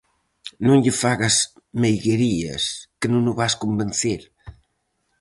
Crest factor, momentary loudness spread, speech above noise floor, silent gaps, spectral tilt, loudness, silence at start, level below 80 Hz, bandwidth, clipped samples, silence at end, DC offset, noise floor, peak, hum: 16 dB; 9 LU; 51 dB; none; -4.5 dB/octave; -21 LUFS; 0.45 s; -50 dBFS; 11.5 kHz; under 0.1%; 0.7 s; under 0.1%; -71 dBFS; -4 dBFS; none